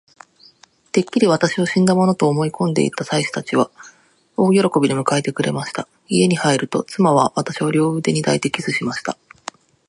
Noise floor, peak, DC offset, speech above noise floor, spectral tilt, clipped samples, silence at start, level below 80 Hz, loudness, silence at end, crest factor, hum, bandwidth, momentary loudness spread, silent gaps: -51 dBFS; 0 dBFS; under 0.1%; 34 dB; -5.5 dB/octave; under 0.1%; 0.95 s; -62 dBFS; -18 LUFS; 0.75 s; 18 dB; none; 11.5 kHz; 10 LU; none